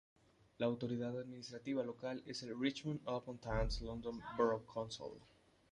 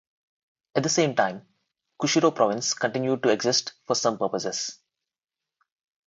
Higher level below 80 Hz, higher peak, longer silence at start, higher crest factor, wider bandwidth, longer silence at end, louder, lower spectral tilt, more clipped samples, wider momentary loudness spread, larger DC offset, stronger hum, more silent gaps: first, -54 dBFS vs -72 dBFS; second, -22 dBFS vs -6 dBFS; second, 0.6 s vs 0.75 s; about the same, 20 dB vs 20 dB; first, 10.5 kHz vs 8 kHz; second, 0.45 s vs 1.35 s; second, -42 LUFS vs -25 LUFS; first, -6 dB/octave vs -3.5 dB/octave; neither; about the same, 10 LU vs 8 LU; neither; neither; neither